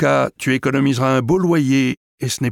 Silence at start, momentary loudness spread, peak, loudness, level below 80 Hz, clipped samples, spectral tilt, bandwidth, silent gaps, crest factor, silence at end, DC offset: 0 s; 6 LU; -4 dBFS; -17 LUFS; -50 dBFS; under 0.1%; -6 dB/octave; 16.5 kHz; 1.97-2.18 s; 12 dB; 0 s; under 0.1%